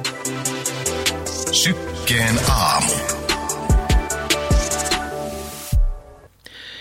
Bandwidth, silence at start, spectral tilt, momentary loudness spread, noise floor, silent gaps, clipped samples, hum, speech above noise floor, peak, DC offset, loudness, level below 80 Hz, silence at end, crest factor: 16.5 kHz; 0 s; -3 dB/octave; 12 LU; -44 dBFS; none; under 0.1%; none; 26 dB; -4 dBFS; under 0.1%; -20 LUFS; -26 dBFS; 0 s; 16 dB